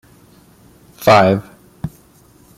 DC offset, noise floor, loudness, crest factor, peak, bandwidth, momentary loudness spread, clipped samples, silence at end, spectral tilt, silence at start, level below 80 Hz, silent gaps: under 0.1%; -48 dBFS; -13 LUFS; 18 dB; 0 dBFS; 16 kHz; 20 LU; under 0.1%; 0.7 s; -6 dB/octave; 1 s; -50 dBFS; none